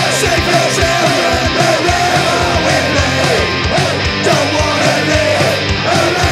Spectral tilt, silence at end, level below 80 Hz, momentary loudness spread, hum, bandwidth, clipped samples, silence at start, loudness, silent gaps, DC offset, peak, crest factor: -4 dB/octave; 0 s; -28 dBFS; 2 LU; none; 16 kHz; under 0.1%; 0 s; -12 LUFS; none; under 0.1%; 0 dBFS; 12 dB